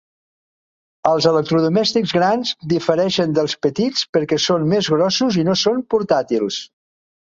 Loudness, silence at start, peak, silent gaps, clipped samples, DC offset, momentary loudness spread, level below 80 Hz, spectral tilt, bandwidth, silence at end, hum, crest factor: -17 LUFS; 1.05 s; -2 dBFS; 4.09-4.13 s; under 0.1%; under 0.1%; 5 LU; -58 dBFS; -5 dB/octave; 7.8 kHz; 0.55 s; none; 16 dB